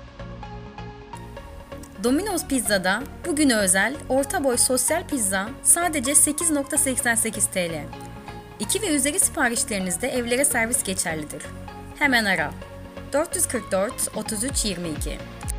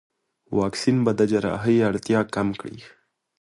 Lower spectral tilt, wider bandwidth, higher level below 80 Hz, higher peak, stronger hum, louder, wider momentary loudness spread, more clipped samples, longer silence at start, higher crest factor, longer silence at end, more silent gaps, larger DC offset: second, -2.5 dB/octave vs -6.5 dB/octave; first, 16 kHz vs 11.5 kHz; first, -42 dBFS vs -54 dBFS; about the same, -4 dBFS vs -6 dBFS; neither; about the same, -21 LUFS vs -22 LUFS; first, 20 LU vs 8 LU; neither; second, 0 s vs 0.5 s; about the same, 20 dB vs 16 dB; second, 0 s vs 0.55 s; neither; neither